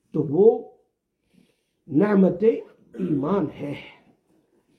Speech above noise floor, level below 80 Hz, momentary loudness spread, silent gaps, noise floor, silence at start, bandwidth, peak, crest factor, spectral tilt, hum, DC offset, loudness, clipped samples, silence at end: 52 dB; -64 dBFS; 16 LU; none; -73 dBFS; 0.15 s; 4.6 kHz; -4 dBFS; 18 dB; -10.5 dB/octave; none; under 0.1%; -22 LUFS; under 0.1%; 0.9 s